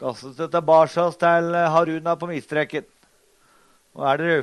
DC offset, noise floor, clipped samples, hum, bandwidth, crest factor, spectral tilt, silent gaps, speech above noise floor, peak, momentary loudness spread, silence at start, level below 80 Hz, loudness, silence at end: under 0.1%; -59 dBFS; under 0.1%; none; 11.5 kHz; 16 dB; -6 dB/octave; none; 39 dB; -4 dBFS; 11 LU; 0 s; -68 dBFS; -21 LUFS; 0 s